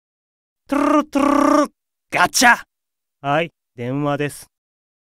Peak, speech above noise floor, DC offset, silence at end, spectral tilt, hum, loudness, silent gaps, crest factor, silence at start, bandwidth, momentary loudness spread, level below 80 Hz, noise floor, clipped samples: 0 dBFS; 68 dB; under 0.1%; 0.75 s; -3.5 dB/octave; none; -18 LUFS; none; 20 dB; 0.7 s; 16 kHz; 14 LU; -52 dBFS; -85 dBFS; under 0.1%